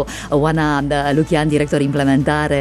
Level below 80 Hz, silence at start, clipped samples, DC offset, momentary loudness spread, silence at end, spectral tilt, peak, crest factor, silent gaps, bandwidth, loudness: -34 dBFS; 0 s; under 0.1%; under 0.1%; 2 LU; 0 s; -6.5 dB/octave; -2 dBFS; 14 dB; none; 13 kHz; -16 LUFS